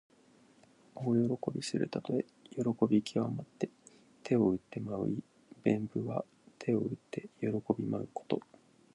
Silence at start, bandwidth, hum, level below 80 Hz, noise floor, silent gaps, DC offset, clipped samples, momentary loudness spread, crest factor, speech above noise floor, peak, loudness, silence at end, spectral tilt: 0.95 s; 11 kHz; none; -70 dBFS; -64 dBFS; none; under 0.1%; under 0.1%; 11 LU; 22 dB; 30 dB; -14 dBFS; -35 LUFS; 0.55 s; -7 dB/octave